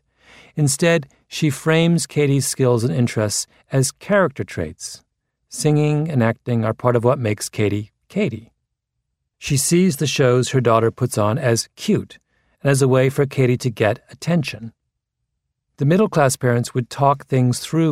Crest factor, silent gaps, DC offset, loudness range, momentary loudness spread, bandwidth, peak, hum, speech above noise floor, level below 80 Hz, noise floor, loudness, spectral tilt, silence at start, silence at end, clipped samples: 18 dB; none; under 0.1%; 3 LU; 11 LU; 16 kHz; 0 dBFS; none; 59 dB; -54 dBFS; -77 dBFS; -19 LUFS; -5.5 dB/octave; 0.55 s; 0 s; under 0.1%